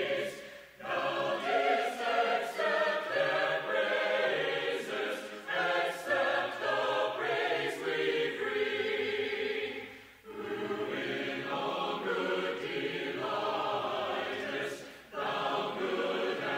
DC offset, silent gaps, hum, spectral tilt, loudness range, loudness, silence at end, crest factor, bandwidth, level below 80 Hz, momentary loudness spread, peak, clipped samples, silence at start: under 0.1%; none; none; -3.5 dB/octave; 4 LU; -32 LUFS; 0 s; 16 dB; 16 kHz; -74 dBFS; 8 LU; -16 dBFS; under 0.1%; 0 s